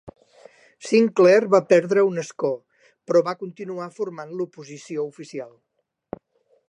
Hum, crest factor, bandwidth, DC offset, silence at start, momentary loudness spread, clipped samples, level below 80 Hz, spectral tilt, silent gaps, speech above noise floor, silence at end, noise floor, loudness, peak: none; 18 dB; 10.5 kHz; under 0.1%; 0.05 s; 24 LU; under 0.1%; -70 dBFS; -6 dB/octave; none; 38 dB; 1.2 s; -59 dBFS; -21 LUFS; -4 dBFS